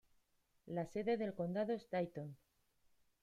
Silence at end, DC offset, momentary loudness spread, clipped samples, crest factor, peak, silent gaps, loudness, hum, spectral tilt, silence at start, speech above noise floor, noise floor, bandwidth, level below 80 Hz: 0.85 s; under 0.1%; 8 LU; under 0.1%; 16 dB; -28 dBFS; none; -42 LUFS; none; -8 dB/octave; 0.65 s; 37 dB; -78 dBFS; 13 kHz; -78 dBFS